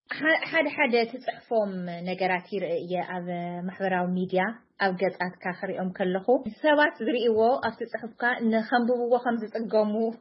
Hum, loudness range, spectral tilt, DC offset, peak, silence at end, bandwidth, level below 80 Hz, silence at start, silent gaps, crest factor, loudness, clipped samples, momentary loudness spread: none; 4 LU; -10 dB/octave; under 0.1%; -10 dBFS; 0.05 s; 5.8 kHz; -74 dBFS; 0.1 s; none; 18 dB; -27 LUFS; under 0.1%; 10 LU